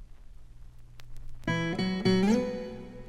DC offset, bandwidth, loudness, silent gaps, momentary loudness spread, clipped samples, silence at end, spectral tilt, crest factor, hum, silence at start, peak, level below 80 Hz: under 0.1%; 11 kHz; -29 LUFS; none; 13 LU; under 0.1%; 0 s; -6.5 dB/octave; 18 dB; 60 Hz at -50 dBFS; 0 s; -14 dBFS; -46 dBFS